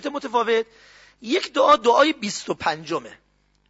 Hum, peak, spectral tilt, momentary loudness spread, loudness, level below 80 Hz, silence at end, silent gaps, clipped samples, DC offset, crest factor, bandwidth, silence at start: 50 Hz at -55 dBFS; -6 dBFS; -3 dB/octave; 14 LU; -21 LUFS; -62 dBFS; 0.6 s; none; under 0.1%; under 0.1%; 18 dB; 8 kHz; 0 s